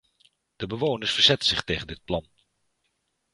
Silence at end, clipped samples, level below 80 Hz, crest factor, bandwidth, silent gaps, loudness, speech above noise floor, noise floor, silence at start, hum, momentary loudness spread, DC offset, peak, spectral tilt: 1.1 s; under 0.1%; -50 dBFS; 24 dB; 11.5 kHz; none; -24 LUFS; 50 dB; -75 dBFS; 0.6 s; none; 14 LU; under 0.1%; -4 dBFS; -3.5 dB/octave